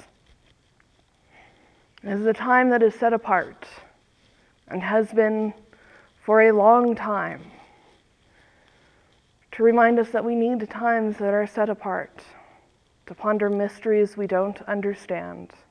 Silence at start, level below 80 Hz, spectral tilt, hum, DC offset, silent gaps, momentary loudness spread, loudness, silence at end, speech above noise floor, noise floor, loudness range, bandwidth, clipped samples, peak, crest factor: 2.05 s; -66 dBFS; -7.5 dB/octave; none; under 0.1%; none; 18 LU; -22 LUFS; 0.25 s; 40 dB; -62 dBFS; 5 LU; 9.6 kHz; under 0.1%; -4 dBFS; 20 dB